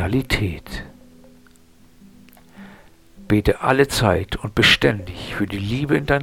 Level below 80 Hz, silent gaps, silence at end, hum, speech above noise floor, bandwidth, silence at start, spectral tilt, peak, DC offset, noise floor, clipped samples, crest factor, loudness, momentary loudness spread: -36 dBFS; none; 0 s; none; 32 dB; 17.5 kHz; 0 s; -5 dB/octave; 0 dBFS; 0.2%; -52 dBFS; under 0.1%; 22 dB; -19 LUFS; 15 LU